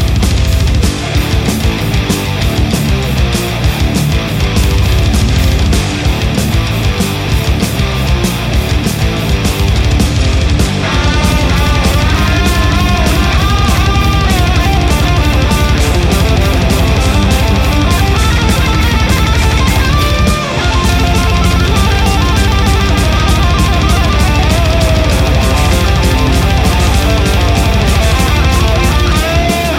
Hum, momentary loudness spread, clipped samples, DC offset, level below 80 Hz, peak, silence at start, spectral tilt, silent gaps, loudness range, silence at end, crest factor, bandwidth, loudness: none; 3 LU; under 0.1%; under 0.1%; -14 dBFS; 0 dBFS; 0 s; -5 dB/octave; none; 2 LU; 0 s; 10 dB; 16.5 kHz; -11 LUFS